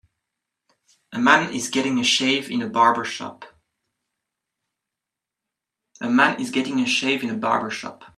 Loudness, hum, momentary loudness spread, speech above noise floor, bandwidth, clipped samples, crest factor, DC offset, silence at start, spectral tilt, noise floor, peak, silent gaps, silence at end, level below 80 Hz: -20 LUFS; none; 14 LU; 65 dB; 13.5 kHz; under 0.1%; 24 dB; under 0.1%; 1.1 s; -3 dB/octave; -86 dBFS; 0 dBFS; none; 0.1 s; -70 dBFS